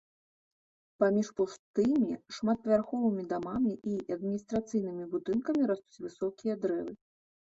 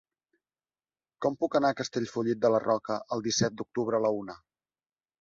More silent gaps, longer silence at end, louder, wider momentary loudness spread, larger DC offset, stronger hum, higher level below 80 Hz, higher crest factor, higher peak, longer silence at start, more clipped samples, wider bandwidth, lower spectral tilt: first, 1.59-1.74 s vs none; second, 0.6 s vs 0.85 s; second, -32 LUFS vs -29 LUFS; about the same, 8 LU vs 7 LU; neither; neither; about the same, -68 dBFS vs -68 dBFS; about the same, 18 dB vs 18 dB; about the same, -14 dBFS vs -12 dBFS; second, 1 s vs 1.2 s; neither; about the same, 7.8 kHz vs 7.8 kHz; first, -7 dB/octave vs -4.5 dB/octave